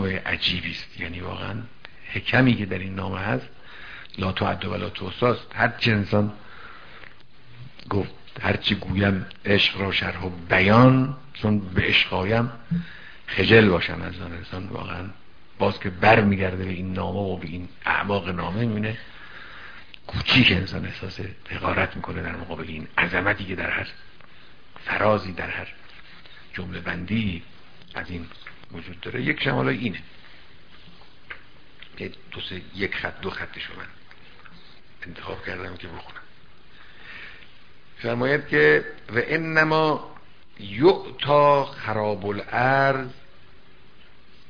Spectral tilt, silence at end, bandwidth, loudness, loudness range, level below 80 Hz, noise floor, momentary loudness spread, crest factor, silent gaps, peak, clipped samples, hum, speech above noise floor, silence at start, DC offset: -7.5 dB/octave; 1.35 s; 5.4 kHz; -23 LUFS; 13 LU; -48 dBFS; -53 dBFS; 23 LU; 24 dB; none; -2 dBFS; under 0.1%; none; 29 dB; 0 s; 0.9%